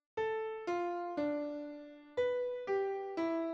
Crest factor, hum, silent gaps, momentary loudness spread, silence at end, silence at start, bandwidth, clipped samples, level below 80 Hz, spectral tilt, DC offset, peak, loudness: 14 dB; none; none; 7 LU; 0 s; 0.15 s; 7.8 kHz; under 0.1%; -76 dBFS; -5.5 dB/octave; under 0.1%; -24 dBFS; -37 LUFS